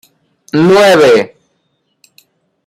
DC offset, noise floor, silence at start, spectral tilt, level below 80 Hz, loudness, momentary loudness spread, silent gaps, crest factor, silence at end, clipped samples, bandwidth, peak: under 0.1%; -63 dBFS; 0.55 s; -5 dB/octave; -54 dBFS; -8 LUFS; 12 LU; none; 12 dB; 1.4 s; under 0.1%; 16 kHz; 0 dBFS